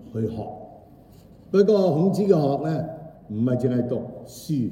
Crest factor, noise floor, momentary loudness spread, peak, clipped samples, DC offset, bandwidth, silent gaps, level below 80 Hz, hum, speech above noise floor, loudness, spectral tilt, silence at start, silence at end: 18 dB; -49 dBFS; 18 LU; -4 dBFS; under 0.1%; under 0.1%; 16 kHz; none; -58 dBFS; none; 27 dB; -23 LUFS; -8.5 dB/octave; 0 s; 0 s